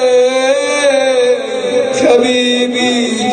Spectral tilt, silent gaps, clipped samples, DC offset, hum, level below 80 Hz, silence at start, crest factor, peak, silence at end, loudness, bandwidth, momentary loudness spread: -2.5 dB/octave; none; under 0.1%; under 0.1%; none; -58 dBFS; 0 s; 12 dB; 0 dBFS; 0 s; -11 LUFS; 9.4 kHz; 4 LU